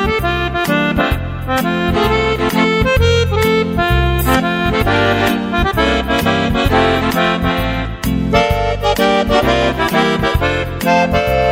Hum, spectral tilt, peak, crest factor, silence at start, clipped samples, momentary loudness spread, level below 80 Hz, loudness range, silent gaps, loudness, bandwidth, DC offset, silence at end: none; -5.5 dB/octave; 0 dBFS; 14 dB; 0 s; under 0.1%; 4 LU; -24 dBFS; 1 LU; none; -14 LUFS; 16.5 kHz; under 0.1%; 0 s